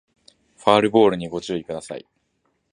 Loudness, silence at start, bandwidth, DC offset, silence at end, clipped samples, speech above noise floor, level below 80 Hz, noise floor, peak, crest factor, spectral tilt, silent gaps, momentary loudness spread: -20 LUFS; 0.65 s; 10.5 kHz; under 0.1%; 0.75 s; under 0.1%; 50 dB; -58 dBFS; -70 dBFS; 0 dBFS; 22 dB; -5.5 dB/octave; none; 18 LU